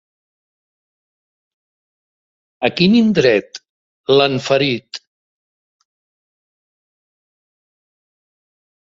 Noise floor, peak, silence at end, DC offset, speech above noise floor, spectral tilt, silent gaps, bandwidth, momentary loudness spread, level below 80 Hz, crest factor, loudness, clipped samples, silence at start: under -90 dBFS; 0 dBFS; 3.85 s; under 0.1%; over 76 dB; -6 dB/octave; 3.70-4.04 s; 7.8 kHz; 20 LU; -58 dBFS; 20 dB; -15 LUFS; under 0.1%; 2.6 s